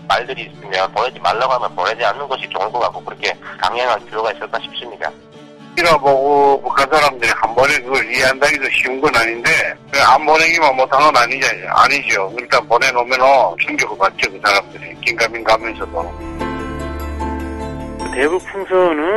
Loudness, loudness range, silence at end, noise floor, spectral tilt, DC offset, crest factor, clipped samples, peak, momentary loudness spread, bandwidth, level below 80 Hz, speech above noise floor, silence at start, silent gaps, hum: -15 LUFS; 8 LU; 0 s; -38 dBFS; -3 dB/octave; under 0.1%; 16 dB; under 0.1%; 0 dBFS; 13 LU; 16 kHz; -38 dBFS; 23 dB; 0 s; none; none